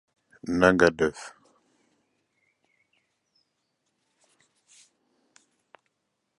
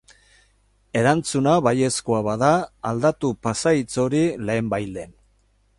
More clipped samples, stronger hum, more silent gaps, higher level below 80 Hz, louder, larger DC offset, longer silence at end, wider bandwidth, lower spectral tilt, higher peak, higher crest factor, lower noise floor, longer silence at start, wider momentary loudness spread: neither; second, none vs 50 Hz at -55 dBFS; neither; about the same, -56 dBFS vs -52 dBFS; about the same, -23 LUFS vs -21 LUFS; neither; first, 5.1 s vs 0.7 s; about the same, 11.5 kHz vs 11.5 kHz; about the same, -5.5 dB/octave vs -5.5 dB/octave; about the same, -4 dBFS vs -4 dBFS; first, 28 dB vs 18 dB; first, -79 dBFS vs -62 dBFS; second, 0.45 s vs 0.95 s; first, 24 LU vs 9 LU